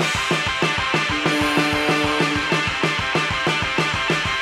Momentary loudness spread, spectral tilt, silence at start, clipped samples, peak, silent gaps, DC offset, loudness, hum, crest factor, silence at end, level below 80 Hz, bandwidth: 2 LU; -3.5 dB/octave; 0 s; under 0.1%; -6 dBFS; none; under 0.1%; -19 LUFS; none; 16 dB; 0 s; -42 dBFS; 15.5 kHz